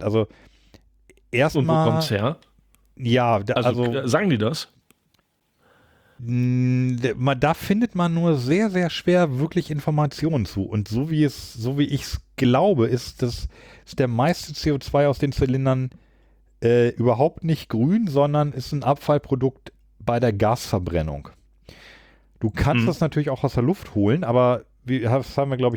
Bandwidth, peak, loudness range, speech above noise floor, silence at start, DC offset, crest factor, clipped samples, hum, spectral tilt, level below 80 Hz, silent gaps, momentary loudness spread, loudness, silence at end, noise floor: 19.5 kHz; -6 dBFS; 3 LU; 46 dB; 0 s; under 0.1%; 16 dB; under 0.1%; none; -7 dB/octave; -44 dBFS; none; 8 LU; -22 LUFS; 0 s; -67 dBFS